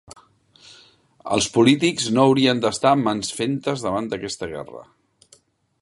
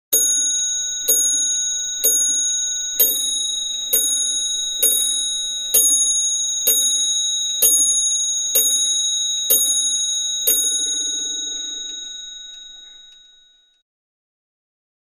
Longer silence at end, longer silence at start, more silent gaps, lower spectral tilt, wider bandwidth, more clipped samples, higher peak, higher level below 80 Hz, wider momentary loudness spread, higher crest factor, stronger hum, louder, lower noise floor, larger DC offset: second, 1 s vs 2.05 s; first, 1.25 s vs 0.1 s; neither; first, -4.5 dB/octave vs 3.5 dB/octave; second, 11.5 kHz vs 15.5 kHz; neither; about the same, -2 dBFS vs -2 dBFS; about the same, -56 dBFS vs -58 dBFS; first, 14 LU vs 9 LU; about the same, 20 dB vs 18 dB; neither; second, -20 LUFS vs -16 LUFS; about the same, -57 dBFS vs -54 dBFS; neither